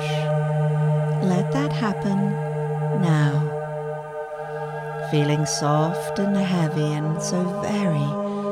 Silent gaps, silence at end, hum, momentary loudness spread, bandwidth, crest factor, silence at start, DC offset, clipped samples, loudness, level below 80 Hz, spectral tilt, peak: none; 0 s; none; 9 LU; 12 kHz; 14 dB; 0 s; under 0.1%; under 0.1%; -23 LUFS; -58 dBFS; -6.5 dB/octave; -8 dBFS